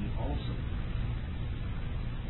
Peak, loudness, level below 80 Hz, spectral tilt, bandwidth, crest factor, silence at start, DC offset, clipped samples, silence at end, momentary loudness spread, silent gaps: -22 dBFS; -37 LUFS; -36 dBFS; -10.5 dB/octave; 4.2 kHz; 12 dB; 0 s; under 0.1%; under 0.1%; 0 s; 3 LU; none